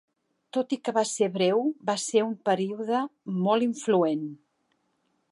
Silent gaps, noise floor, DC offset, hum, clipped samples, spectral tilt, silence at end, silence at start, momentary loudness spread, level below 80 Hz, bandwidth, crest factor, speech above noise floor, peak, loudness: none; -73 dBFS; under 0.1%; none; under 0.1%; -5 dB/octave; 0.95 s; 0.55 s; 7 LU; -82 dBFS; 11.5 kHz; 18 dB; 47 dB; -10 dBFS; -27 LUFS